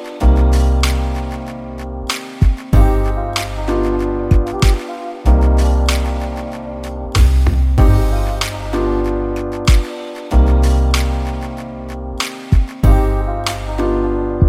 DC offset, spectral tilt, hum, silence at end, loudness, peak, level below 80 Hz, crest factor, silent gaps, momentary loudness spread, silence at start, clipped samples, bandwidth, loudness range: under 0.1%; -6 dB/octave; none; 0 s; -17 LUFS; 0 dBFS; -16 dBFS; 14 dB; none; 13 LU; 0 s; under 0.1%; 14.5 kHz; 2 LU